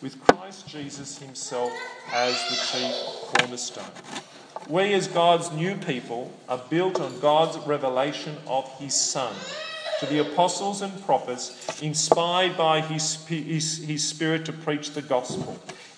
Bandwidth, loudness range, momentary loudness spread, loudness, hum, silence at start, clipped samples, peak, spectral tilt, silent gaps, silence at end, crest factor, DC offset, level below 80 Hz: 10.5 kHz; 3 LU; 14 LU; -25 LUFS; none; 0 s; under 0.1%; 0 dBFS; -3.5 dB/octave; none; 0 s; 26 dB; under 0.1%; -66 dBFS